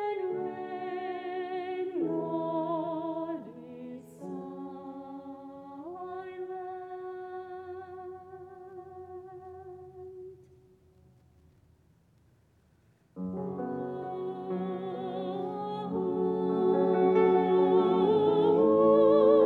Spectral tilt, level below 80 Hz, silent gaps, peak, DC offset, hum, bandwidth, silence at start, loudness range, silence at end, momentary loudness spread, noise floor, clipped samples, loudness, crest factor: -9 dB/octave; -72 dBFS; none; -12 dBFS; under 0.1%; none; 4.5 kHz; 0 s; 22 LU; 0 s; 22 LU; -65 dBFS; under 0.1%; -29 LUFS; 18 dB